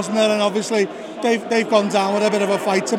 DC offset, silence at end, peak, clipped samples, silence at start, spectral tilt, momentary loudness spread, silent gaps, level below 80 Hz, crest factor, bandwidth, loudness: under 0.1%; 0 s; -2 dBFS; under 0.1%; 0 s; -4 dB/octave; 4 LU; none; -76 dBFS; 18 dB; 15.5 kHz; -19 LUFS